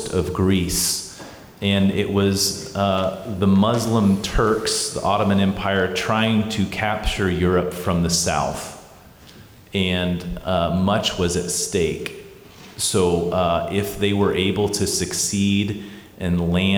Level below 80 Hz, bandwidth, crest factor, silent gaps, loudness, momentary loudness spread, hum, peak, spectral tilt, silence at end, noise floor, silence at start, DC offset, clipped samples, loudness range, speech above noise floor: -40 dBFS; 20 kHz; 14 dB; none; -20 LUFS; 8 LU; none; -8 dBFS; -4.5 dB/octave; 0 s; -45 dBFS; 0 s; under 0.1%; under 0.1%; 3 LU; 25 dB